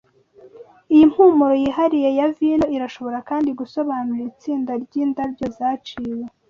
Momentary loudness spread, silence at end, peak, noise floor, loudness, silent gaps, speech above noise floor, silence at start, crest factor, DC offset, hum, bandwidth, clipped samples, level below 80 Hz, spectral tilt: 14 LU; 0.2 s; -4 dBFS; -49 dBFS; -19 LUFS; none; 30 dB; 0.45 s; 16 dB; under 0.1%; none; 6.8 kHz; under 0.1%; -54 dBFS; -7 dB/octave